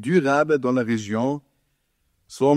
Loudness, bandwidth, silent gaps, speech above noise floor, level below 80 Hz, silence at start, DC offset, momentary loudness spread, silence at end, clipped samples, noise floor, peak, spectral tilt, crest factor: -22 LUFS; 13 kHz; none; 50 dB; -66 dBFS; 0 s; under 0.1%; 11 LU; 0 s; under 0.1%; -70 dBFS; -6 dBFS; -6.5 dB/octave; 16 dB